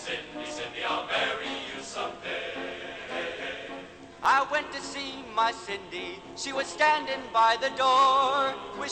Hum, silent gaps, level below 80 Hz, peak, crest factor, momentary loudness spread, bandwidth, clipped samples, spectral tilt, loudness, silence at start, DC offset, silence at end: none; none; -62 dBFS; -10 dBFS; 18 dB; 14 LU; 9 kHz; under 0.1%; -2 dB/octave; -28 LUFS; 0 s; under 0.1%; 0 s